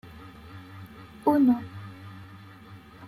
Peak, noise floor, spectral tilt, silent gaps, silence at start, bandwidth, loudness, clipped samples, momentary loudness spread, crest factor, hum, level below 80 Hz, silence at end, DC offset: -10 dBFS; -48 dBFS; -8.5 dB/octave; none; 0.25 s; 13.5 kHz; -24 LUFS; under 0.1%; 25 LU; 20 dB; none; -62 dBFS; 0 s; under 0.1%